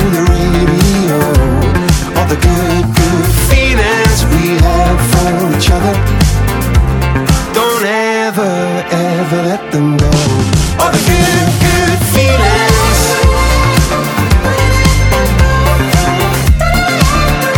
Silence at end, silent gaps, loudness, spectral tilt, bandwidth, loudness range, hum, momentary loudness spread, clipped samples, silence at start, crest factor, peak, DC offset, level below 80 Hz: 0 s; none; -10 LUFS; -5 dB/octave; 19.5 kHz; 3 LU; none; 4 LU; under 0.1%; 0 s; 10 dB; 0 dBFS; under 0.1%; -16 dBFS